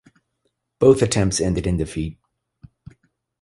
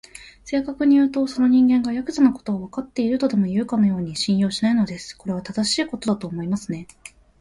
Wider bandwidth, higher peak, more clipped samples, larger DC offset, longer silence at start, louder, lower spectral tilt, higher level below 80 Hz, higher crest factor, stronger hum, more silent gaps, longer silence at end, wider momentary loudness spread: about the same, 11.5 kHz vs 11.5 kHz; first, -2 dBFS vs -6 dBFS; neither; neither; first, 0.8 s vs 0.15 s; about the same, -20 LUFS vs -21 LUFS; about the same, -5.5 dB/octave vs -5.5 dB/octave; first, -38 dBFS vs -54 dBFS; about the same, 20 dB vs 16 dB; neither; neither; first, 1.3 s vs 0.3 s; about the same, 13 LU vs 12 LU